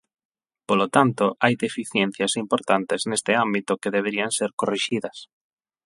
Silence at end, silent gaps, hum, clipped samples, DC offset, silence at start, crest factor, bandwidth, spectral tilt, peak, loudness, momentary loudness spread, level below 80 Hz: 0.6 s; 4.53-4.58 s; none; under 0.1%; under 0.1%; 0.7 s; 24 dB; 11.5 kHz; -4 dB/octave; 0 dBFS; -23 LUFS; 5 LU; -68 dBFS